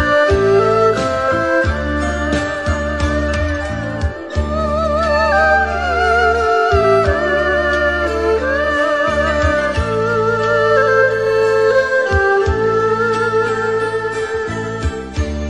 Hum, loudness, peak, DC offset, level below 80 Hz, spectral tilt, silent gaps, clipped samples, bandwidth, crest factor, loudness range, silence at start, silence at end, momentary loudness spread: none; -15 LUFS; -2 dBFS; 0.4%; -28 dBFS; -6 dB/octave; none; under 0.1%; 11 kHz; 14 dB; 4 LU; 0 s; 0 s; 8 LU